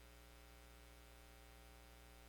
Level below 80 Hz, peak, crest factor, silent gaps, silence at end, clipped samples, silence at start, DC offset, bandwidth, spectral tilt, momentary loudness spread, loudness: -64 dBFS; -48 dBFS; 14 dB; none; 0 s; under 0.1%; 0 s; under 0.1%; 19 kHz; -3.5 dB/octave; 0 LU; -63 LUFS